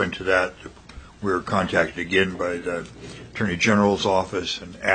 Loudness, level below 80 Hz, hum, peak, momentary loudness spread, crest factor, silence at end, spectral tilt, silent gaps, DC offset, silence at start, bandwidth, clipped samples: -23 LUFS; -50 dBFS; none; -2 dBFS; 16 LU; 20 dB; 0 s; -4.5 dB/octave; none; under 0.1%; 0 s; 9.4 kHz; under 0.1%